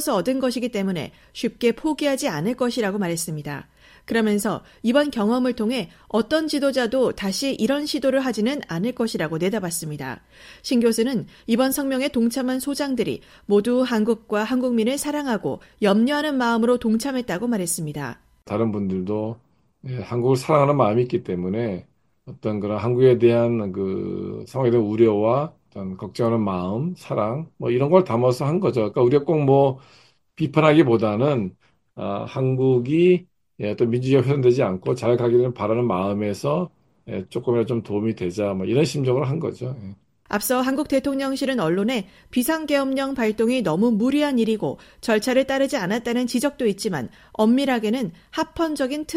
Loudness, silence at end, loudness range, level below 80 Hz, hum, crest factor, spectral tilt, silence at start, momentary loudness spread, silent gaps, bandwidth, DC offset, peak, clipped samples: -22 LUFS; 0 s; 4 LU; -56 dBFS; none; 20 dB; -6 dB/octave; 0 s; 11 LU; none; 16 kHz; under 0.1%; -2 dBFS; under 0.1%